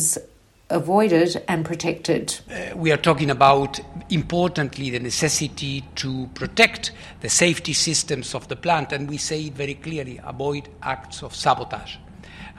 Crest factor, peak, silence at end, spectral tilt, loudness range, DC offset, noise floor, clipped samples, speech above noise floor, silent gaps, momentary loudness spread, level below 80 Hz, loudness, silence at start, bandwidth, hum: 22 dB; 0 dBFS; 0 s; -3.5 dB/octave; 6 LU; under 0.1%; -49 dBFS; under 0.1%; 27 dB; none; 14 LU; -48 dBFS; -22 LUFS; 0 s; 16 kHz; none